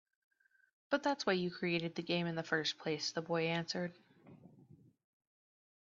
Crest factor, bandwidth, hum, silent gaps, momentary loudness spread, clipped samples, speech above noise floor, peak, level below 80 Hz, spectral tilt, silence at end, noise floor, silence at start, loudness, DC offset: 20 dB; 7.4 kHz; none; none; 4 LU; under 0.1%; 26 dB; -20 dBFS; -80 dBFS; -3.5 dB/octave; 1.25 s; -64 dBFS; 0.9 s; -37 LUFS; under 0.1%